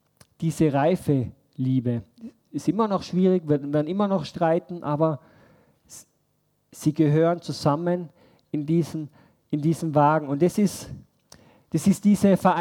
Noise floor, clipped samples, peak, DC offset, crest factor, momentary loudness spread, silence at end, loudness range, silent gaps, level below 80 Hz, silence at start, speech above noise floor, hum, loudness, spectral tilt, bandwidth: -70 dBFS; under 0.1%; -6 dBFS; under 0.1%; 18 dB; 13 LU; 0 s; 2 LU; none; -60 dBFS; 0.4 s; 47 dB; none; -24 LUFS; -7.5 dB/octave; 16.5 kHz